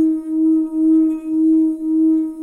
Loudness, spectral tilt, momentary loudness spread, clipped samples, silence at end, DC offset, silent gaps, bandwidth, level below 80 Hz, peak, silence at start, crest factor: -16 LUFS; -8.5 dB/octave; 3 LU; under 0.1%; 0 s; under 0.1%; none; 1.3 kHz; -58 dBFS; -8 dBFS; 0 s; 8 dB